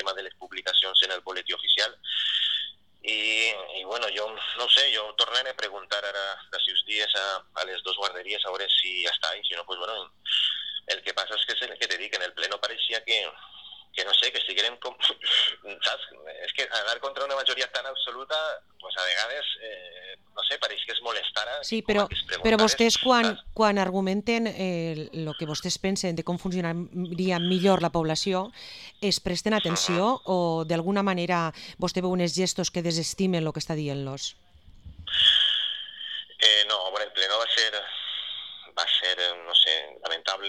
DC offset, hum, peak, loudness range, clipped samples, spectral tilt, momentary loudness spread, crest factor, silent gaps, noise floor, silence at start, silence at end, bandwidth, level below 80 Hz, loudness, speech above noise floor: under 0.1%; none; -4 dBFS; 5 LU; under 0.1%; -3 dB/octave; 13 LU; 24 dB; none; -48 dBFS; 0 s; 0 s; 14.5 kHz; -56 dBFS; -25 LUFS; 21 dB